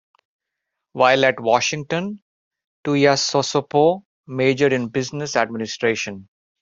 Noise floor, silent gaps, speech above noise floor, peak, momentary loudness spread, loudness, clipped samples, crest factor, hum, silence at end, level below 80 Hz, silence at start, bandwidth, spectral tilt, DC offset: -81 dBFS; 2.22-2.51 s, 2.67-2.84 s, 4.05-4.23 s; 62 dB; -2 dBFS; 14 LU; -19 LUFS; under 0.1%; 20 dB; none; 0.4 s; -64 dBFS; 0.95 s; 7.8 kHz; -4 dB/octave; under 0.1%